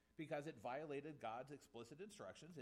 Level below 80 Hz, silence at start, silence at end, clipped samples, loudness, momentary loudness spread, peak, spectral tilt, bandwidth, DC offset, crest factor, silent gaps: -86 dBFS; 0.2 s; 0 s; under 0.1%; -53 LUFS; 8 LU; -36 dBFS; -5.5 dB/octave; 15.5 kHz; under 0.1%; 16 dB; none